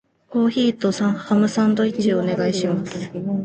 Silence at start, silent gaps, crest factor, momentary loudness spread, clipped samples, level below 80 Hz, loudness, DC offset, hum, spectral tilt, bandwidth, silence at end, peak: 0.3 s; none; 14 dB; 7 LU; under 0.1%; -60 dBFS; -20 LUFS; under 0.1%; none; -6 dB/octave; 8.8 kHz; 0 s; -6 dBFS